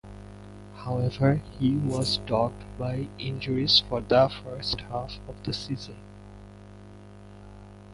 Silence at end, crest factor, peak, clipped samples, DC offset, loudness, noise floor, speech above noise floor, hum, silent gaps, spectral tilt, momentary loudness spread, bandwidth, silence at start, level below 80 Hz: 0 s; 22 dB; -8 dBFS; under 0.1%; under 0.1%; -27 LUFS; -47 dBFS; 20 dB; 50 Hz at -45 dBFS; none; -6 dB/octave; 26 LU; 11.5 kHz; 0.05 s; -48 dBFS